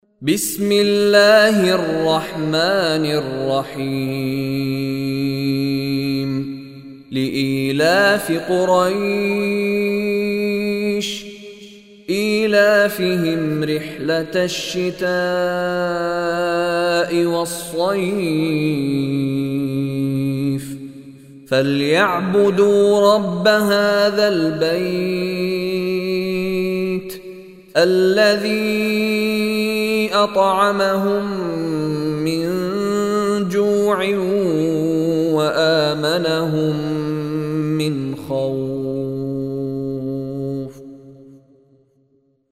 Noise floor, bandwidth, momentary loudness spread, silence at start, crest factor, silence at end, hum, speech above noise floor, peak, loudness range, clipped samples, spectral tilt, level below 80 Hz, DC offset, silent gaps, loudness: -60 dBFS; 16 kHz; 10 LU; 0.2 s; 18 dB; 1.15 s; none; 43 dB; 0 dBFS; 6 LU; under 0.1%; -5.5 dB/octave; -54 dBFS; under 0.1%; none; -18 LUFS